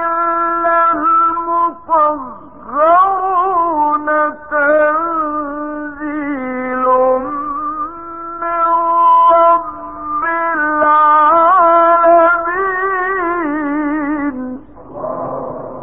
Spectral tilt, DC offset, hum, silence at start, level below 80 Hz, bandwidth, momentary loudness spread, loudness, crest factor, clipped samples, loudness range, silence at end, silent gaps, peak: -9 dB/octave; 0.8%; none; 0 s; -50 dBFS; 3.9 kHz; 15 LU; -13 LUFS; 12 dB; under 0.1%; 7 LU; 0 s; none; -2 dBFS